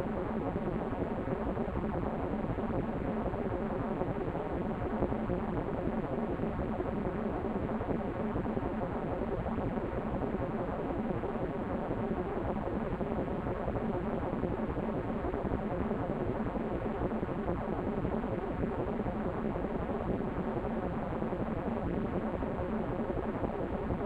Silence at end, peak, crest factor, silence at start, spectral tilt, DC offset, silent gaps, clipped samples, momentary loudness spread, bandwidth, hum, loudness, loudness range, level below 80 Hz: 0 s; -16 dBFS; 18 dB; 0 s; -10 dB/octave; under 0.1%; none; under 0.1%; 1 LU; 8 kHz; none; -35 LUFS; 0 LU; -44 dBFS